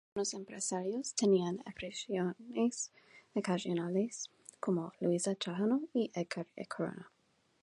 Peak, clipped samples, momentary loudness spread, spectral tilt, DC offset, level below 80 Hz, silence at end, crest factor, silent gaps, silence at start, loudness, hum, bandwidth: -18 dBFS; under 0.1%; 10 LU; -5 dB/octave; under 0.1%; -76 dBFS; 0.55 s; 18 dB; none; 0.15 s; -36 LUFS; none; 11.5 kHz